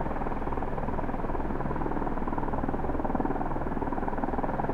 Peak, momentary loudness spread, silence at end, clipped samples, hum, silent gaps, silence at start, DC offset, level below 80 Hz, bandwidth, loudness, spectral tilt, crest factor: -14 dBFS; 3 LU; 0 s; under 0.1%; none; none; 0 s; under 0.1%; -34 dBFS; 4.1 kHz; -32 LUFS; -9.5 dB/octave; 14 dB